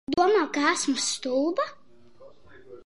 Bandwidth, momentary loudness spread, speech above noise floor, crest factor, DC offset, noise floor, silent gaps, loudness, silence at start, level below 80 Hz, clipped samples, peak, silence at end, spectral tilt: 11.5 kHz; 7 LU; 28 dB; 18 dB; 0.3%; -55 dBFS; none; -25 LUFS; 0.1 s; -64 dBFS; under 0.1%; -10 dBFS; 0.1 s; -2 dB/octave